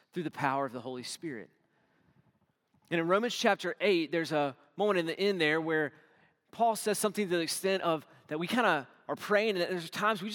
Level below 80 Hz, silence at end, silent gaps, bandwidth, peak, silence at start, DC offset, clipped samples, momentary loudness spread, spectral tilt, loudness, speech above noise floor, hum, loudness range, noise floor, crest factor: -88 dBFS; 0 s; none; 18 kHz; -10 dBFS; 0.15 s; under 0.1%; under 0.1%; 11 LU; -4 dB/octave; -31 LUFS; 42 dB; none; 4 LU; -73 dBFS; 22 dB